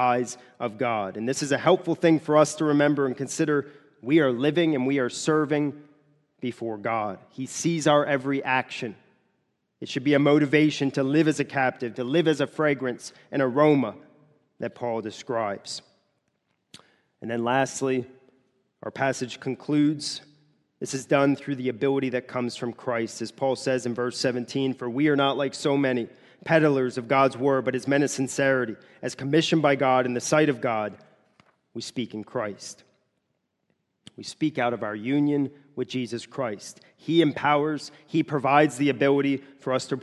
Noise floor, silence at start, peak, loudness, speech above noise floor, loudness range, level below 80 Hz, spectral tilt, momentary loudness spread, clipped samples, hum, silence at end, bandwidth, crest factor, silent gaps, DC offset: -77 dBFS; 0 s; -4 dBFS; -25 LUFS; 52 dB; 7 LU; -70 dBFS; -5.5 dB/octave; 13 LU; under 0.1%; none; 0 s; 12 kHz; 22 dB; none; under 0.1%